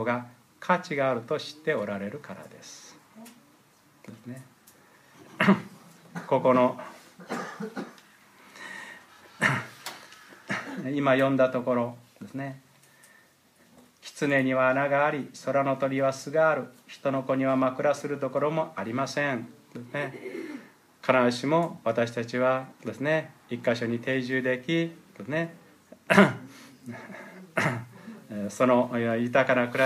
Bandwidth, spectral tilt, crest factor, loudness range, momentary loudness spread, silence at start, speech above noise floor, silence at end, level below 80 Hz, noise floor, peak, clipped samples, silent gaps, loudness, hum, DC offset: 15.5 kHz; -6 dB/octave; 26 dB; 7 LU; 21 LU; 0 s; 34 dB; 0 s; -76 dBFS; -61 dBFS; -2 dBFS; under 0.1%; none; -27 LUFS; none; under 0.1%